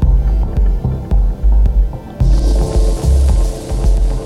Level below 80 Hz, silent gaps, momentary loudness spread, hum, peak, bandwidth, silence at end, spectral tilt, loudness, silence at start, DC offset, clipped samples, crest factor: -12 dBFS; none; 5 LU; none; -2 dBFS; 11.5 kHz; 0 s; -7.5 dB/octave; -16 LUFS; 0 s; under 0.1%; under 0.1%; 10 dB